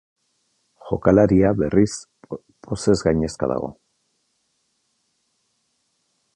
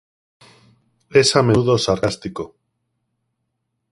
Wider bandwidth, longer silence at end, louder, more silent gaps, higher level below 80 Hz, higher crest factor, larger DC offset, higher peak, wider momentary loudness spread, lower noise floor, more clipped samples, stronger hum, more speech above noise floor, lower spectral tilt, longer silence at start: about the same, 11 kHz vs 11.5 kHz; first, 2.65 s vs 1.45 s; second, -20 LUFS vs -17 LUFS; neither; first, -44 dBFS vs -50 dBFS; about the same, 20 dB vs 20 dB; neither; about the same, -2 dBFS vs 0 dBFS; first, 21 LU vs 17 LU; second, -70 dBFS vs -75 dBFS; neither; neither; second, 52 dB vs 58 dB; first, -7 dB/octave vs -4.5 dB/octave; second, 0.85 s vs 1.1 s